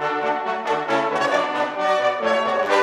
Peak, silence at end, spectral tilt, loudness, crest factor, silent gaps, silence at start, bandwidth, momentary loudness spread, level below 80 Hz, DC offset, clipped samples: -4 dBFS; 0 s; -3.5 dB/octave; -21 LUFS; 16 dB; none; 0 s; 11.5 kHz; 3 LU; -72 dBFS; under 0.1%; under 0.1%